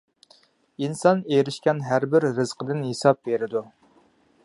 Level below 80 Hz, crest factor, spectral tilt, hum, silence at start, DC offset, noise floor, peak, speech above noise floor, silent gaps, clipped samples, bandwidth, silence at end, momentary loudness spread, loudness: -70 dBFS; 22 dB; -6 dB/octave; none; 0.8 s; under 0.1%; -60 dBFS; -2 dBFS; 37 dB; none; under 0.1%; 11.5 kHz; 0.75 s; 9 LU; -23 LUFS